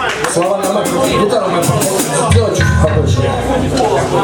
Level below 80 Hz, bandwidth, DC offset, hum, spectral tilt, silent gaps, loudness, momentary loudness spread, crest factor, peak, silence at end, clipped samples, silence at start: -28 dBFS; 19 kHz; under 0.1%; none; -5 dB/octave; none; -13 LUFS; 3 LU; 12 dB; 0 dBFS; 0 s; under 0.1%; 0 s